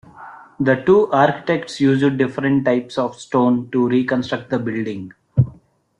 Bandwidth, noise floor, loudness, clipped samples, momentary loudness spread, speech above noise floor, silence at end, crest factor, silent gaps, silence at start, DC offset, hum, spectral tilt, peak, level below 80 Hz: 10.5 kHz; -48 dBFS; -18 LUFS; under 0.1%; 9 LU; 30 dB; 0.5 s; 16 dB; none; 0.15 s; under 0.1%; none; -7.5 dB/octave; -2 dBFS; -54 dBFS